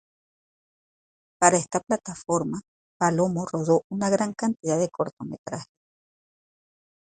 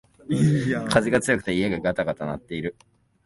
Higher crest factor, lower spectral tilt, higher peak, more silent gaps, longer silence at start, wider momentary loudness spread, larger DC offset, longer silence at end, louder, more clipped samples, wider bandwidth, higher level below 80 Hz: about the same, 24 dB vs 20 dB; about the same, -5 dB/octave vs -6 dB/octave; about the same, -2 dBFS vs -4 dBFS; first, 2.68-3.00 s, 3.84-3.90 s, 5.13-5.17 s, 5.38-5.45 s vs none; first, 1.4 s vs 0.3 s; first, 15 LU vs 11 LU; neither; first, 1.4 s vs 0.55 s; about the same, -25 LUFS vs -24 LUFS; neither; second, 9.6 kHz vs 11.5 kHz; second, -64 dBFS vs -50 dBFS